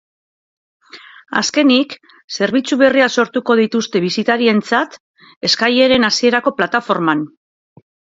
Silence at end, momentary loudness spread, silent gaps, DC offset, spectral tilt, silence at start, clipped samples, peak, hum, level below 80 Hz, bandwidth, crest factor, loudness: 0.9 s; 9 LU; 2.24-2.28 s, 5.00-5.14 s, 5.36-5.41 s; under 0.1%; -3.5 dB/octave; 0.95 s; under 0.1%; 0 dBFS; none; -58 dBFS; 7.8 kHz; 16 dB; -15 LUFS